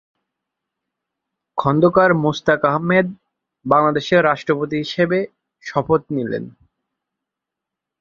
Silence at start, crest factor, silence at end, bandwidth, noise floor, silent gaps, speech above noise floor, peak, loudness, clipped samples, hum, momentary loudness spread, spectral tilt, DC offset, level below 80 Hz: 1.55 s; 20 dB; 1.5 s; 7.4 kHz; -84 dBFS; none; 67 dB; 0 dBFS; -18 LUFS; under 0.1%; none; 13 LU; -7 dB/octave; under 0.1%; -56 dBFS